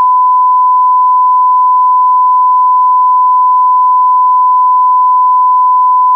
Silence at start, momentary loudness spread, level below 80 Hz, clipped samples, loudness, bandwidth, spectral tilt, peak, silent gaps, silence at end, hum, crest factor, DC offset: 0 s; 0 LU; under -90 dBFS; under 0.1%; -7 LUFS; 1.2 kHz; -3.5 dB/octave; -4 dBFS; none; 0 s; none; 4 dB; under 0.1%